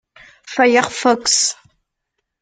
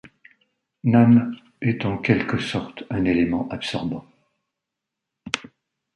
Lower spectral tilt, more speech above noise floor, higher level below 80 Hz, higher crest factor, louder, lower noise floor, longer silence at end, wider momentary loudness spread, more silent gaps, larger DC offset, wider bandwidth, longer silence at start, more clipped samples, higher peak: second, -1 dB/octave vs -7 dB/octave; second, 60 dB vs 64 dB; second, -60 dBFS vs -50 dBFS; about the same, 18 dB vs 20 dB; first, -15 LUFS vs -22 LUFS; second, -76 dBFS vs -84 dBFS; first, 0.9 s vs 0.55 s; about the same, 11 LU vs 13 LU; neither; neither; about the same, 10 kHz vs 10.5 kHz; first, 0.45 s vs 0.05 s; neither; first, 0 dBFS vs -4 dBFS